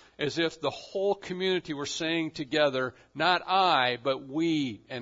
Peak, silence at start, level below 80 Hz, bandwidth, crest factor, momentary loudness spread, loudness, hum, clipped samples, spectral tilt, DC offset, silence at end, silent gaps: -10 dBFS; 0.2 s; -68 dBFS; 7.8 kHz; 18 dB; 9 LU; -28 LUFS; none; under 0.1%; -4 dB/octave; under 0.1%; 0 s; none